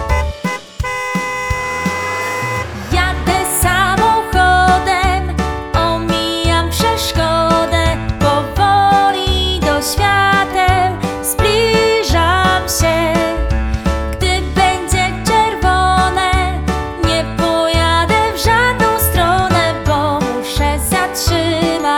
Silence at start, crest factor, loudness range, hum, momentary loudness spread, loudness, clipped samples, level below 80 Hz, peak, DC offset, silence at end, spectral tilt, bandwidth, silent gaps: 0 s; 14 dB; 2 LU; none; 6 LU; -14 LUFS; under 0.1%; -24 dBFS; 0 dBFS; under 0.1%; 0 s; -4 dB/octave; 20 kHz; none